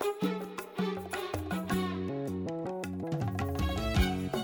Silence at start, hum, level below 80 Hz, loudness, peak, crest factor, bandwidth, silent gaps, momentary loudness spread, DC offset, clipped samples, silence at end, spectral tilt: 0 s; none; -42 dBFS; -34 LUFS; -16 dBFS; 16 dB; over 20 kHz; none; 7 LU; under 0.1%; under 0.1%; 0 s; -6 dB/octave